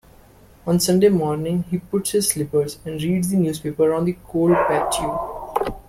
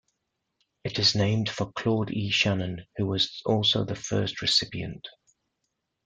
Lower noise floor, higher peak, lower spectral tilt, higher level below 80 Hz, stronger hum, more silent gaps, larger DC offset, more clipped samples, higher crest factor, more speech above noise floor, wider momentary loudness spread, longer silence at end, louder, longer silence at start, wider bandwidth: second, -49 dBFS vs -80 dBFS; first, -4 dBFS vs -8 dBFS; about the same, -5.5 dB/octave vs -4.5 dB/octave; first, -46 dBFS vs -58 dBFS; neither; neither; neither; neither; about the same, 16 dB vs 20 dB; second, 29 dB vs 54 dB; second, 9 LU vs 12 LU; second, 0.1 s vs 0.95 s; first, -20 LUFS vs -26 LUFS; second, 0.65 s vs 0.85 s; first, 16.5 kHz vs 9.2 kHz